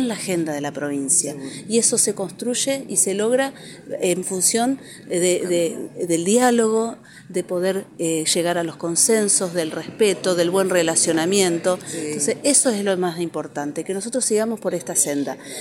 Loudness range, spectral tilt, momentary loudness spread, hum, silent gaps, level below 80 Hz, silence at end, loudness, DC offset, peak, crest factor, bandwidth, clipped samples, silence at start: 2 LU; -3 dB/octave; 11 LU; none; none; -70 dBFS; 0 s; -20 LUFS; under 0.1%; -2 dBFS; 18 dB; 16.5 kHz; under 0.1%; 0 s